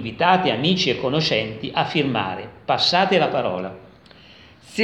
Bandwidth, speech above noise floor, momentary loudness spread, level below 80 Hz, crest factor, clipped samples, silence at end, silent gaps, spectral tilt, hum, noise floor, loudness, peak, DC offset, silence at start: 10.5 kHz; 27 dB; 12 LU; -56 dBFS; 20 dB; under 0.1%; 0 s; none; -5 dB/octave; none; -47 dBFS; -20 LUFS; -2 dBFS; under 0.1%; 0 s